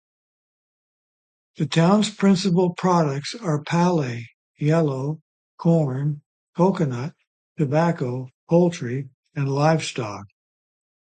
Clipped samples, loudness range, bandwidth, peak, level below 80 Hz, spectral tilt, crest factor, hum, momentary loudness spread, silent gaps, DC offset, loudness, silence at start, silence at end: under 0.1%; 3 LU; 9.2 kHz; -4 dBFS; -64 dBFS; -6.5 dB/octave; 18 dB; none; 13 LU; 4.34-4.54 s, 5.22-5.58 s, 6.26-6.53 s, 7.27-7.56 s, 8.34-8.47 s, 9.14-9.23 s; under 0.1%; -22 LUFS; 1.6 s; 0.8 s